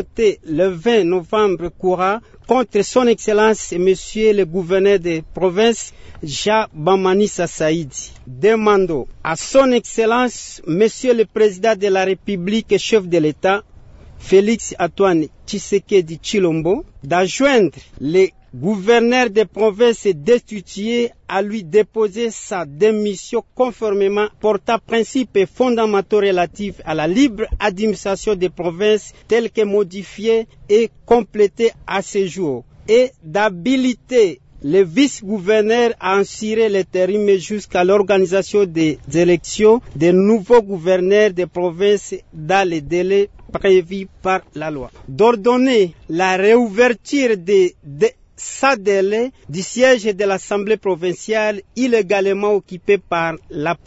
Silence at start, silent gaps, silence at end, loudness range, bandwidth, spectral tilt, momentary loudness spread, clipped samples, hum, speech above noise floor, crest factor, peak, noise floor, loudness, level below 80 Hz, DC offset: 0 s; none; 0.1 s; 3 LU; 8 kHz; -5 dB/octave; 9 LU; under 0.1%; none; 24 dB; 14 dB; -2 dBFS; -40 dBFS; -17 LUFS; -44 dBFS; under 0.1%